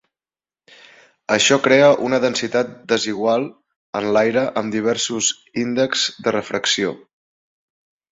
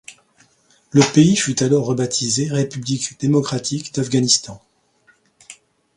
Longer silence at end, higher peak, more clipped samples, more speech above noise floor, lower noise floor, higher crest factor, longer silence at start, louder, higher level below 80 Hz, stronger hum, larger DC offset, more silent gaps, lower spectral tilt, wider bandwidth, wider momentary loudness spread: first, 1.15 s vs 0.45 s; about the same, -2 dBFS vs 0 dBFS; neither; first, over 72 dB vs 40 dB; first, under -90 dBFS vs -58 dBFS; about the same, 18 dB vs 20 dB; first, 1.3 s vs 0.1 s; about the same, -18 LUFS vs -18 LUFS; second, -62 dBFS vs -56 dBFS; neither; neither; first, 3.76-3.93 s vs none; second, -3 dB/octave vs -4.5 dB/octave; second, 8.4 kHz vs 11.5 kHz; about the same, 10 LU vs 9 LU